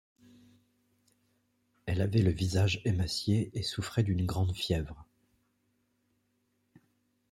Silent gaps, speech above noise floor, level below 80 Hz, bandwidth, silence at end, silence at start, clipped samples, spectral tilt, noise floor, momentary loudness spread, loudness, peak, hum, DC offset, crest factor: none; 46 dB; -54 dBFS; 13.5 kHz; 2.3 s; 1.85 s; under 0.1%; -6 dB/octave; -76 dBFS; 7 LU; -31 LUFS; -14 dBFS; none; under 0.1%; 20 dB